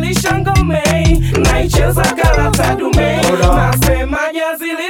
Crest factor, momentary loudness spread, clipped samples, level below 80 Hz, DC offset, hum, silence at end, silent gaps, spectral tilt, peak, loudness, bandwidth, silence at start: 12 dB; 4 LU; under 0.1%; -18 dBFS; under 0.1%; none; 0 s; none; -5 dB/octave; 0 dBFS; -13 LUFS; 19 kHz; 0 s